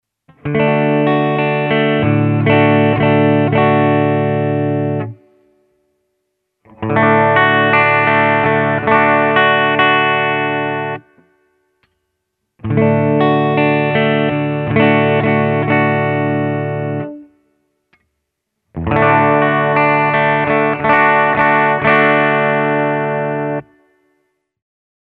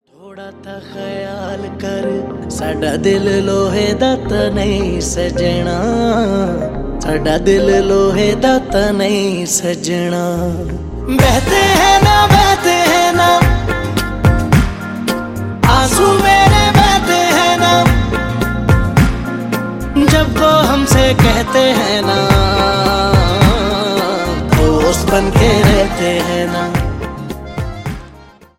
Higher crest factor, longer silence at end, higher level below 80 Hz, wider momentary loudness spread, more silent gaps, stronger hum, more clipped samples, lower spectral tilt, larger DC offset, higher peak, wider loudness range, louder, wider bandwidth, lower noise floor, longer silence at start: about the same, 14 dB vs 12 dB; first, 1.45 s vs 0.35 s; second, -48 dBFS vs -24 dBFS; second, 9 LU vs 13 LU; neither; neither; neither; first, -10 dB/octave vs -5 dB/octave; neither; about the same, 0 dBFS vs 0 dBFS; about the same, 6 LU vs 5 LU; about the same, -13 LUFS vs -13 LUFS; second, 4.7 kHz vs 17 kHz; first, -73 dBFS vs -40 dBFS; first, 0.45 s vs 0.25 s